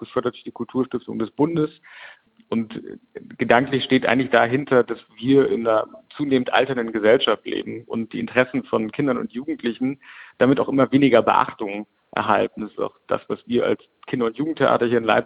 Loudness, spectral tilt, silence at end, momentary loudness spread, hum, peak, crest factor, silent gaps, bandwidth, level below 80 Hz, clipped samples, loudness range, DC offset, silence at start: -21 LUFS; -8.5 dB/octave; 0 s; 12 LU; none; -2 dBFS; 20 dB; none; 5 kHz; -62 dBFS; under 0.1%; 5 LU; under 0.1%; 0 s